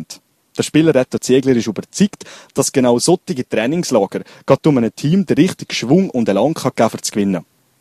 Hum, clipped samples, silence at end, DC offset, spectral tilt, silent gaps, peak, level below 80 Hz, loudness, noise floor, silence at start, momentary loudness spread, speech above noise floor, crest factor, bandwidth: none; under 0.1%; 0.4 s; under 0.1%; -5.5 dB/octave; none; 0 dBFS; -54 dBFS; -16 LUFS; -40 dBFS; 0 s; 10 LU; 25 dB; 16 dB; 14 kHz